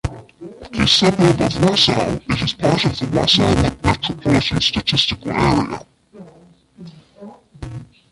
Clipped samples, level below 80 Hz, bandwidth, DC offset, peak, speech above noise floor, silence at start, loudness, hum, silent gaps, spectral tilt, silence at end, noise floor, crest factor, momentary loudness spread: under 0.1%; -36 dBFS; 11.5 kHz; under 0.1%; 0 dBFS; 32 dB; 0.05 s; -16 LUFS; none; none; -5 dB/octave; 0.25 s; -48 dBFS; 18 dB; 20 LU